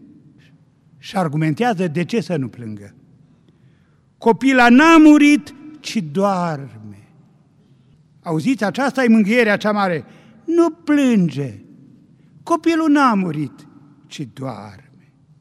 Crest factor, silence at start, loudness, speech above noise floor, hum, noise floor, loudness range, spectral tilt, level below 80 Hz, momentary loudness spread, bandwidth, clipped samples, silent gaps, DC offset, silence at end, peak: 16 dB; 1.05 s; -16 LUFS; 39 dB; none; -55 dBFS; 9 LU; -6 dB/octave; -56 dBFS; 22 LU; 12.5 kHz; under 0.1%; none; under 0.1%; 0.7 s; -2 dBFS